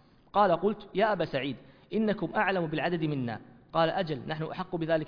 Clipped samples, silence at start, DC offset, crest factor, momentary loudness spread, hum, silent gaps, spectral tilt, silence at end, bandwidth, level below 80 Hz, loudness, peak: under 0.1%; 0.35 s; under 0.1%; 18 dB; 9 LU; none; none; -8.5 dB/octave; 0 s; 5.2 kHz; -60 dBFS; -30 LUFS; -12 dBFS